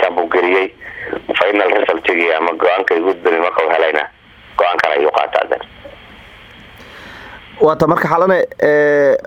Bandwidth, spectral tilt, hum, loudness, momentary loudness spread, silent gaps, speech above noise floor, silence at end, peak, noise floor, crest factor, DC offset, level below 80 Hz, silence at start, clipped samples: 14 kHz; -6 dB/octave; none; -14 LUFS; 14 LU; none; 25 dB; 0 s; 0 dBFS; -39 dBFS; 16 dB; under 0.1%; -50 dBFS; 0 s; under 0.1%